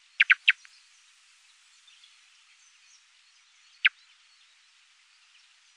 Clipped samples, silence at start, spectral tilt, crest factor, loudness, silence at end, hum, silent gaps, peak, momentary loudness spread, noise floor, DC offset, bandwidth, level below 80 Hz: under 0.1%; 0.2 s; 6.5 dB/octave; 28 dB; -23 LUFS; 1.9 s; none; none; -6 dBFS; 7 LU; -62 dBFS; under 0.1%; 11 kHz; under -90 dBFS